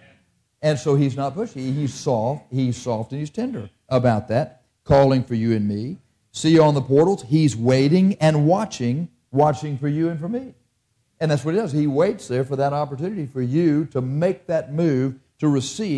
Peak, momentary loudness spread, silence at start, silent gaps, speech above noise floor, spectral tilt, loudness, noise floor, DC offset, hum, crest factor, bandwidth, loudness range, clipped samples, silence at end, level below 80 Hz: -6 dBFS; 11 LU; 0.6 s; none; 49 dB; -7 dB/octave; -21 LUFS; -68 dBFS; under 0.1%; none; 16 dB; 11 kHz; 5 LU; under 0.1%; 0 s; -52 dBFS